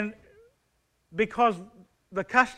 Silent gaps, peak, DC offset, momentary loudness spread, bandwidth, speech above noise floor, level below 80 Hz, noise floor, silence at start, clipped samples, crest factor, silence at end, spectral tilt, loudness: none; -8 dBFS; under 0.1%; 15 LU; 11 kHz; 47 dB; -62 dBFS; -72 dBFS; 0 s; under 0.1%; 22 dB; 0.05 s; -5 dB/octave; -27 LUFS